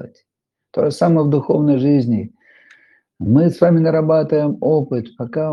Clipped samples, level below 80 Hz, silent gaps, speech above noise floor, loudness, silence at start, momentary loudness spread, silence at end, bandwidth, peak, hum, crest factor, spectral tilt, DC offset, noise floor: under 0.1%; -58 dBFS; none; 67 dB; -16 LUFS; 0 s; 10 LU; 0 s; 11.5 kHz; 0 dBFS; none; 16 dB; -9.5 dB/octave; under 0.1%; -82 dBFS